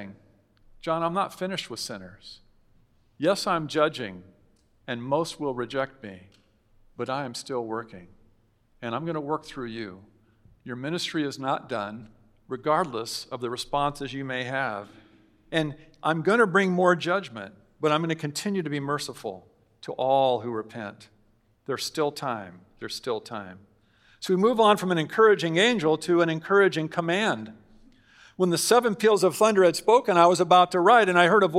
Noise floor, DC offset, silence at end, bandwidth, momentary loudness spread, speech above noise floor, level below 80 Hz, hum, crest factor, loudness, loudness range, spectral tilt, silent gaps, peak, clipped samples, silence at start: -64 dBFS; under 0.1%; 0 s; 16 kHz; 19 LU; 39 dB; -64 dBFS; none; 24 dB; -25 LUFS; 11 LU; -4.5 dB/octave; none; -2 dBFS; under 0.1%; 0 s